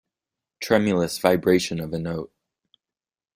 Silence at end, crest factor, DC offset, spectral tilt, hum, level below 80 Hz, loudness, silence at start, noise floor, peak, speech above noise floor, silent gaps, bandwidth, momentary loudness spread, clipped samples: 1.1 s; 22 dB; under 0.1%; -5.5 dB/octave; none; -56 dBFS; -23 LUFS; 0.6 s; under -90 dBFS; -2 dBFS; over 68 dB; none; 16 kHz; 14 LU; under 0.1%